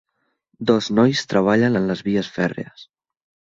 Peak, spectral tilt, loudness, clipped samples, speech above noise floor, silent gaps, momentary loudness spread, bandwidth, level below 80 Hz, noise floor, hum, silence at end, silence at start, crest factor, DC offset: -2 dBFS; -6 dB/octave; -19 LUFS; under 0.1%; 48 dB; none; 9 LU; 7.8 kHz; -56 dBFS; -67 dBFS; none; 0.7 s; 0.6 s; 18 dB; under 0.1%